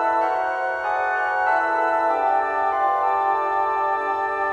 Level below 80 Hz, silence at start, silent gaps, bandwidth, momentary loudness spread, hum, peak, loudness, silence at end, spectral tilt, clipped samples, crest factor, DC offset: -60 dBFS; 0 s; none; 9.2 kHz; 3 LU; none; -8 dBFS; -21 LUFS; 0 s; -4 dB/octave; under 0.1%; 12 dB; under 0.1%